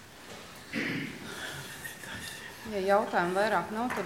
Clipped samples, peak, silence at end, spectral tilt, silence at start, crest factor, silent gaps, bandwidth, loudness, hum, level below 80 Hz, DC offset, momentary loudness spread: under 0.1%; -12 dBFS; 0 s; -4.5 dB/octave; 0 s; 22 dB; none; 16.5 kHz; -32 LUFS; none; -64 dBFS; under 0.1%; 16 LU